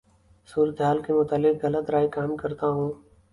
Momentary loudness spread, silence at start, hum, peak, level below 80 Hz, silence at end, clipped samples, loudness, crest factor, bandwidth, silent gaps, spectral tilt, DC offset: 7 LU; 0.5 s; none; -10 dBFS; -58 dBFS; 0.35 s; under 0.1%; -25 LUFS; 16 dB; 11 kHz; none; -8.5 dB/octave; under 0.1%